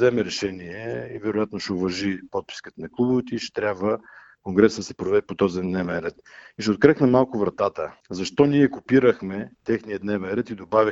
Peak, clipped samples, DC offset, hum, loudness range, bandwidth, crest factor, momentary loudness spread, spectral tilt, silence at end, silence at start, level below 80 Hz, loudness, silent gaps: 0 dBFS; under 0.1%; under 0.1%; none; 6 LU; 8 kHz; 22 dB; 13 LU; -6 dB/octave; 0 s; 0 s; -56 dBFS; -23 LUFS; none